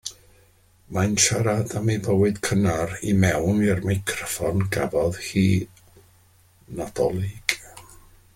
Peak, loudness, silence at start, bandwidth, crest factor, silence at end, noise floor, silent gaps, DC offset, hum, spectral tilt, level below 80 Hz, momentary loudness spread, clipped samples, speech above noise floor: -2 dBFS; -23 LUFS; 0.05 s; 16.5 kHz; 22 dB; 0.55 s; -57 dBFS; none; under 0.1%; none; -5 dB/octave; -48 dBFS; 12 LU; under 0.1%; 35 dB